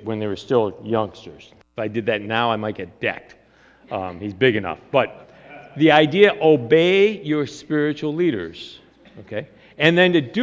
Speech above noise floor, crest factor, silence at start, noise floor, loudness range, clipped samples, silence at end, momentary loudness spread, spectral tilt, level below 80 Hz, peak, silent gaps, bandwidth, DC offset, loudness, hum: 32 dB; 20 dB; 0 s; -52 dBFS; 8 LU; under 0.1%; 0 s; 17 LU; -6.5 dB/octave; -56 dBFS; 0 dBFS; none; 7.8 kHz; under 0.1%; -19 LUFS; none